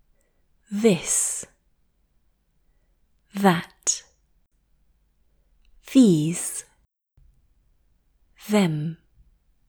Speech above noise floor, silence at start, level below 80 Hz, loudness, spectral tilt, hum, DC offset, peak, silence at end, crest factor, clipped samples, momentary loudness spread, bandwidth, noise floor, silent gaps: 46 dB; 0.7 s; -62 dBFS; -22 LUFS; -4.5 dB/octave; none; under 0.1%; -4 dBFS; 0.75 s; 24 dB; under 0.1%; 17 LU; over 20 kHz; -66 dBFS; none